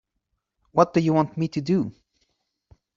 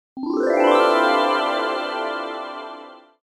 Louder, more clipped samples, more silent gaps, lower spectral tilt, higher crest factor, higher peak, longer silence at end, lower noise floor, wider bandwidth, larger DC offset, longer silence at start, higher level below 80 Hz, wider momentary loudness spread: second, -23 LUFS vs -20 LUFS; neither; neither; first, -8 dB/octave vs -3 dB/octave; about the same, 22 dB vs 18 dB; about the same, -4 dBFS vs -2 dBFS; first, 1.05 s vs 0.25 s; first, -78 dBFS vs -41 dBFS; second, 7.4 kHz vs 13.5 kHz; neither; first, 0.75 s vs 0.15 s; first, -60 dBFS vs -72 dBFS; second, 8 LU vs 17 LU